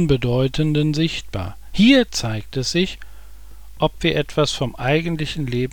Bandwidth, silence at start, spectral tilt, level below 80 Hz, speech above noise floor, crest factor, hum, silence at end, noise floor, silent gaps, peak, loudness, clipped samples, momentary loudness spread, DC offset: 18.5 kHz; 0 s; -5.5 dB/octave; -38 dBFS; 22 dB; 18 dB; none; 0 s; -41 dBFS; none; -2 dBFS; -20 LUFS; under 0.1%; 11 LU; 2%